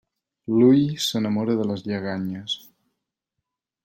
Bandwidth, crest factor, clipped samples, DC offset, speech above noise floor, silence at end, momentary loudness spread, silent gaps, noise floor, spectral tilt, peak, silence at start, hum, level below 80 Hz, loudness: 16.5 kHz; 18 dB; under 0.1%; under 0.1%; 61 dB; 1.25 s; 13 LU; none; -83 dBFS; -6 dB/octave; -6 dBFS; 0.5 s; none; -66 dBFS; -22 LUFS